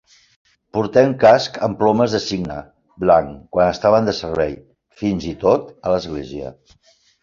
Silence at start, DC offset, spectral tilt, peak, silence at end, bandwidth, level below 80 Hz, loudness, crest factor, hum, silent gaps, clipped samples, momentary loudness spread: 0.75 s; under 0.1%; -6 dB/octave; 0 dBFS; 0.7 s; 7.6 kHz; -46 dBFS; -18 LUFS; 18 dB; none; none; under 0.1%; 15 LU